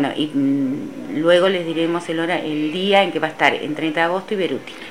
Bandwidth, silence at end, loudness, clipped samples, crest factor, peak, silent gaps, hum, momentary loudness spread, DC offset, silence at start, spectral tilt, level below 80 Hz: 15 kHz; 0 s; -19 LUFS; under 0.1%; 20 dB; 0 dBFS; none; none; 8 LU; 0.5%; 0 s; -5.5 dB/octave; -66 dBFS